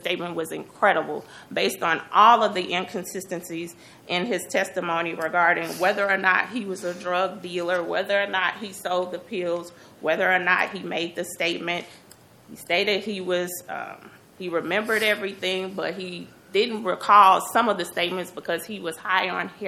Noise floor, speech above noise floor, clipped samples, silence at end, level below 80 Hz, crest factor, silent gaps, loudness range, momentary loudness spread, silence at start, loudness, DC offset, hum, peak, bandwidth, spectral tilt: -51 dBFS; 27 dB; under 0.1%; 0 s; -72 dBFS; 22 dB; none; 5 LU; 13 LU; 0 s; -23 LUFS; under 0.1%; none; -2 dBFS; 17 kHz; -3.5 dB/octave